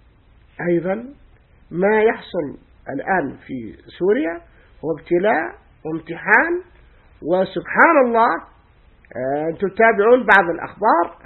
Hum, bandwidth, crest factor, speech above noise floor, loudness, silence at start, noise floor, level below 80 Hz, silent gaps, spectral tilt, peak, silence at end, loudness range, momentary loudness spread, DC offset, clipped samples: none; 4.3 kHz; 20 dB; 33 dB; -18 LUFS; 0.6 s; -51 dBFS; -52 dBFS; none; -8 dB/octave; 0 dBFS; 0.1 s; 6 LU; 19 LU; under 0.1%; under 0.1%